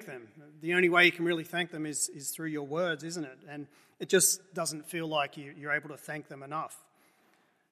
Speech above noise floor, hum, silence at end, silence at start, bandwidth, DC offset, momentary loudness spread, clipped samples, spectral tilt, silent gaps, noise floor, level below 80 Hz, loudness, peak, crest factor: 37 dB; none; 0.95 s; 0 s; 14.5 kHz; under 0.1%; 20 LU; under 0.1%; -2.5 dB/octave; none; -69 dBFS; -84 dBFS; -30 LUFS; -10 dBFS; 24 dB